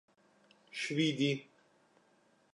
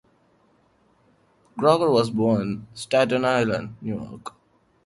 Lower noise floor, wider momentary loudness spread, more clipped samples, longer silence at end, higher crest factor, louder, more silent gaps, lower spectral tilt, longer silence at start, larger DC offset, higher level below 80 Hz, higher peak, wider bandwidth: first, -70 dBFS vs -62 dBFS; second, 10 LU vs 18 LU; neither; first, 1.1 s vs 0.55 s; about the same, 20 dB vs 20 dB; second, -35 LUFS vs -22 LUFS; neither; about the same, -5 dB/octave vs -6 dB/octave; second, 0.75 s vs 1.55 s; neither; second, -88 dBFS vs -58 dBFS; second, -20 dBFS vs -4 dBFS; about the same, 11 kHz vs 11.5 kHz